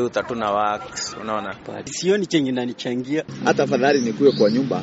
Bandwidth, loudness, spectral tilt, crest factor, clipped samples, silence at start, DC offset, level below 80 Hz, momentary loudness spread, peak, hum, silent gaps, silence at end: 8 kHz; -21 LUFS; -4 dB/octave; 16 dB; under 0.1%; 0 s; under 0.1%; -58 dBFS; 10 LU; -4 dBFS; none; none; 0 s